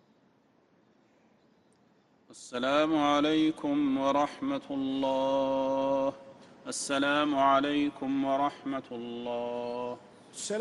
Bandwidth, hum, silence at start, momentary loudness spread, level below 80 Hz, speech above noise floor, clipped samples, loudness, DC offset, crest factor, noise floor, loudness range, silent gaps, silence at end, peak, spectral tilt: 12 kHz; none; 2.3 s; 14 LU; -68 dBFS; 37 dB; under 0.1%; -29 LUFS; under 0.1%; 18 dB; -66 dBFS; 3 LU; none; 0 s; -12 dBFS; -4 dB/octave